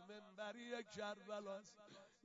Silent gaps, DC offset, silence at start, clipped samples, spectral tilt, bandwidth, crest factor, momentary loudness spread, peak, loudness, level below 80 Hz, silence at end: none; under 0.1%; 0 s; under 0.1%; -2.5 dB/octave; 7.4 kHz; 16 dB; 14 LU; -36 dBFS; -52 LUFS; under -90 dBFS; 0.1 s